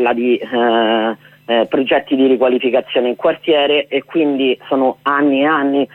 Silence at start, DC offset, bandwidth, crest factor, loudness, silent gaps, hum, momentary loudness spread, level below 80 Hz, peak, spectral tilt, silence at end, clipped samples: 0 s; under 0.1%; 4.1 kHz; 12 dB; -15 LUFS; none; none; 4 LU; -64 dBFS; -2 dBFS; -7 dB/octave; 0.1 s; under 0.1%